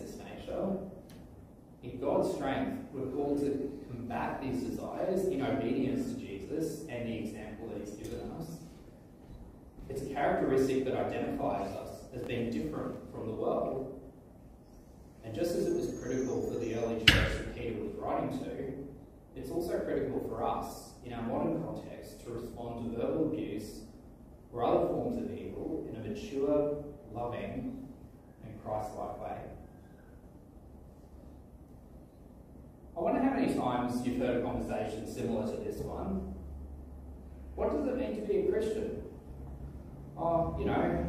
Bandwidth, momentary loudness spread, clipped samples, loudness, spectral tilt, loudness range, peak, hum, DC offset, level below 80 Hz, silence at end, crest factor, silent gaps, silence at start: 15.5 kHz; 23 LU; under 0.1%; -35 LUFS; -5.5 dB/octave; 10 LU; -4 dBFS; none; under 0.1%; -50 dBFS; 0 s; 30 dB; none; 0 s